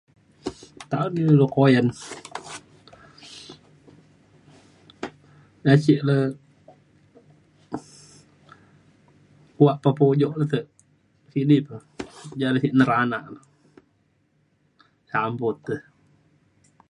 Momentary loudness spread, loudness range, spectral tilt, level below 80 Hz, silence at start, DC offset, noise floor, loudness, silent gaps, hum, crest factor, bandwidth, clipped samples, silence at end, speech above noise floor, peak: 21 LU; 12 LU; -7.5 dB/octave; -64 dBFS; 0.45 s; under 0.1%; -66 dBFS; -21 LUFS; none; none; 24 dB; 11 kHz; under 0.1%; 1.1 s; 46 dB; -2 dBFS